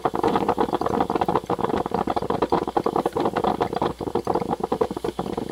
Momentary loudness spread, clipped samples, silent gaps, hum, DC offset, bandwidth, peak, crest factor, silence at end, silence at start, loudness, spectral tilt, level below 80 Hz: 4 LU; under 0.1%; none; none; under 0.1%; 16.5 kHz; -6 dBFS; 18 dB; 0 s; 0 s; -24 LUFS; -6.5 dB/octave; -48 dBFS